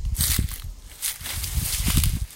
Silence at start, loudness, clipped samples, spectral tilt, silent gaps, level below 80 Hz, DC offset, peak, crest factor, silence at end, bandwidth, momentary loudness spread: 0 s; -25 LUFS; under 0.1%; -2.5 dB/octave; none; -28 dBFS; under 0.1%; -2 dBFS; 22 dB; 0 s; 17 kHz; 10 LU